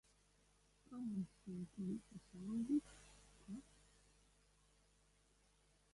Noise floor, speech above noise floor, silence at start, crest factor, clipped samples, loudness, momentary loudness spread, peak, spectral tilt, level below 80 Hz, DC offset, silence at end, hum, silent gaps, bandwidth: -75 dBFS; 29 dB; 0.9 s; 20 dB; under 0.1%; -47 LUFS; 21 LU; -30 dBFS; -7 dB/octave; -74 dBFS; under 0.1%; 2.3 s; 50 Hz at -70 dBFS; none; 11.5 kHz